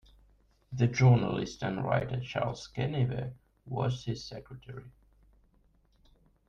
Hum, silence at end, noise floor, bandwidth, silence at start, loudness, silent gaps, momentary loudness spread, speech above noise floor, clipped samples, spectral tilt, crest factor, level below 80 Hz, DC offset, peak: none; 1.6 s; -67 dBFS; 7.2 kHz; 0.7 s; -31 LUFS; none; 21 LU; 37 dB; under 0.1%; -7 dB/octave; 20 dB; -56 dBFS; under 0.1%; -12 dBFS